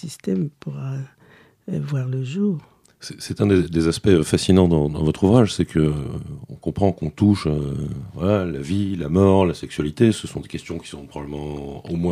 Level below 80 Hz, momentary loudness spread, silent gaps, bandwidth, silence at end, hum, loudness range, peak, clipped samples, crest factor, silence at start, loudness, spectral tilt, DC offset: -42 dBFS; 16 LU; none; 14 kHz; 0 s; none; 5 LU; -2 dBFS; under 0.1%; 18 dB; 0.05 s; -21 LUFS; -7 dB/octave; under 0.1%